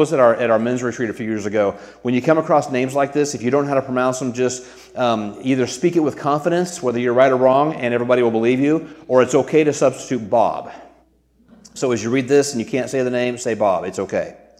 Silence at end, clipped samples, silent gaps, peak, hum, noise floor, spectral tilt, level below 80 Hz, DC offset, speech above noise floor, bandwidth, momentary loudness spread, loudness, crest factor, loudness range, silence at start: 0.25 s; under 0.1%; none; 0 dBFS; none; -56 dBFS; -5.5 dB/octave; -60 dBFS; under 0.1%; 38 dB; 14.5 kHz; 8 LU; -18 LUFS; 18 dB; 4 LU; 0 s